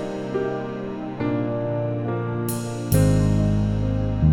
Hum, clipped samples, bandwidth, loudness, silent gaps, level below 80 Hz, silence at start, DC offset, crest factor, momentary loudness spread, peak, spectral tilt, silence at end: none; under 0.1%; 16.5 kHz; -24 LUFS; none; -34 dBFS; 0 s; under 0.1%; 16 dB; 9 LU; -6 dBFS; -7.5 dB/octave; 0 s